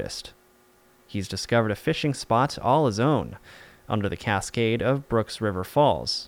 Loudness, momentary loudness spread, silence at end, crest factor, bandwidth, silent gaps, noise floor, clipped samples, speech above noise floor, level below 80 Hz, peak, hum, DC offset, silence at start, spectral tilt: -25 LUFS; 12 LU; 0 s; 16 dB; 18 kHz; none; -58 dBFS; under 0.1%; 34 dB; -50 dBFS; -8 dBFS; none; under 0.1%; 0 s; -5.5 dB/octave